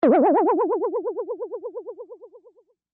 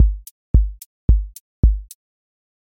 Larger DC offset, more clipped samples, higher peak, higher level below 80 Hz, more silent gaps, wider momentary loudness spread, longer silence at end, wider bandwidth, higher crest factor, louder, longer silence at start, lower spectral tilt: neither; neither; second, -8 dBFS vs -2 dBFS; second, -76 dBFS vs -20 dBFS; second, none vs 0.31-0.54 s, 0.86-1.08 s, 1.40-1.63 s; first, 22 LU vs 11 LU; second, 0.7 s vs 0.85 s; second, 4.3 kHz vs 16 kHz; about the same, 14 dB vs 16 dB; about the same, -22 LUFS vs -21 LUFS; about the same, 0 s vs 0 s; second, -6.5 dB/octave vs -8.5 dB/octave